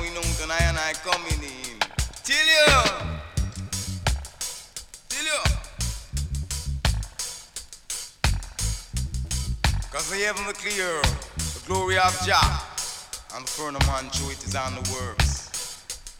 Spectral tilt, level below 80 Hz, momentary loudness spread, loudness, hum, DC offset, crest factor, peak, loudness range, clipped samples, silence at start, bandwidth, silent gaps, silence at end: -3 dB/octave; -32 dBFS; 12 LU; -25 LUFS; none; under 0.1%; 22 dB; -4 dBFS; 7 LU; under 0.1%; 0 s; 18 kHz; none; 0 s